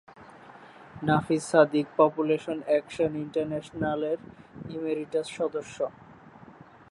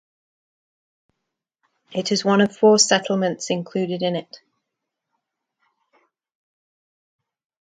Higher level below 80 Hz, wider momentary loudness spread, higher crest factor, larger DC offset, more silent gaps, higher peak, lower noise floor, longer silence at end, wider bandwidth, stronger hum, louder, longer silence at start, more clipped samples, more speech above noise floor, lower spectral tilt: first, -62 dBFS vs -72 dBFS; about the same, 12 LU vs 12 LU; about the same, 22 dB vs 22 dB; neither; neither; second, -6 dBFS vs -2 dBFS; second, -51 dBFS vs -81 dBFS; second, 0.4 s vs 3.4 s; first, 11.5 kHz vs 9.6 kHz; neither; second, -28 LUFS vs -20 LUFS; second, 0.2 s vs 1.9 s; neither; second, 24 dB vs 62 dB; first, -6 dB/octave vs -3.5 dB/octave